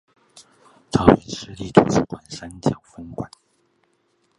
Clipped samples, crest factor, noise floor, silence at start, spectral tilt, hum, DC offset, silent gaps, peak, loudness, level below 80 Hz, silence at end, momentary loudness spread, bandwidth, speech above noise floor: under 0.1%; 22 dB; -66 dBFS; 0.95 s; -6.5 dB/octave; none; under 0.1%; none; 0 dBFS; -20 LUFS; -46 dBFS; 1.15 s; 19 LU; 11.5 kHz; 46 dB